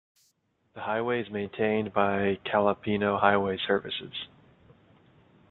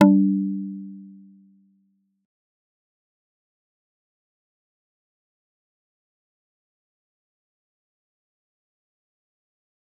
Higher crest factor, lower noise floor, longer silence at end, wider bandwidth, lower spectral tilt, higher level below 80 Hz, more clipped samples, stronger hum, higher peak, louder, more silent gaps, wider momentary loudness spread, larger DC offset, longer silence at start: about the same, 24 dB vs 28 dB; about the same, -71 dBFS vs -68 dBFS; second, 1.25 s vs 8.9 s; first, 4.3 kHz vs 3.7 kHz; about the same, -8 dB/octave vs -7.5 dB/octave; first, -66 dBFS vs -80 dBFS; neither; neither; second, -6 dBFS vs -2 dBFS; second, -28 LUFS vs -22 LUFS; neither; second, 12 LU vs 23 LU; neither; first, 0.75 s vs 0 s